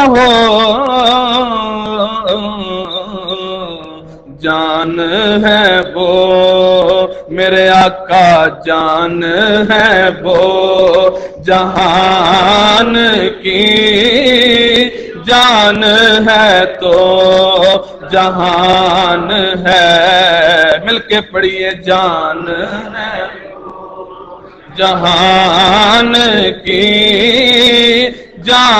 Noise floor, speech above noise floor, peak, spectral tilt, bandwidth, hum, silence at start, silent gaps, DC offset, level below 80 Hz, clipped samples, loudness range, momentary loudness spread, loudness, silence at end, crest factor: -32 dBFS; 24 dB; 0 dBFS; -4 dB/octave; 13 kHz; none; 0 s; none; under 0.1%; -38 dBFS; 0.2%; 8 LU; 12 LU; -9 LUFS; 0 s; 10 dB